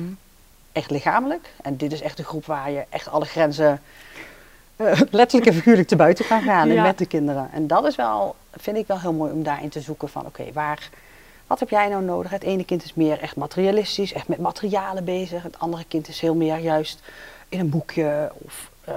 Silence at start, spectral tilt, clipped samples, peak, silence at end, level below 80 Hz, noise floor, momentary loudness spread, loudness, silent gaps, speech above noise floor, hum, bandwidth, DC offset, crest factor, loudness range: 0 s; -6.5 dB/octave; under 0.1%; 0 dBFS; 0 s; -54 dBFS; -51 dBFS; 16 LU; -22 LUFS; none; 30 dB; none; 16 kHz; under 0.1%; 22 dB; 9 LU